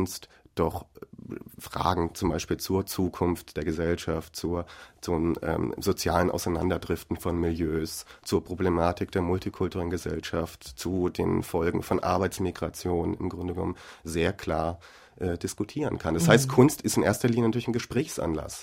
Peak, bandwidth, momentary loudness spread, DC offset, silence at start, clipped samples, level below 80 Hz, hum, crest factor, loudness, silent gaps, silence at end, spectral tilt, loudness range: -2 dBFS; 16.5 kHz; 10 LU; under 0.1%; 0 s; under 0.1%; -46 dBFS; none; 26 dB; -28 LUFS; none; 0 s; -5.5 dB/octave; 5 LU